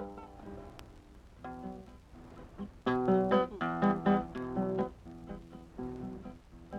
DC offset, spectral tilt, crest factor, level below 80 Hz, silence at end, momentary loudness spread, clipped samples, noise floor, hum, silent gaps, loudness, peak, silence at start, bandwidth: under 0.1%; -8.5 dB/octave; 20 dB; -56 dBFS; 0 s; 23 LU; under 0.1%; -55 dBFS; none; none; -33 LUFS; -16 dBFS; 0 s; 8.2 kHz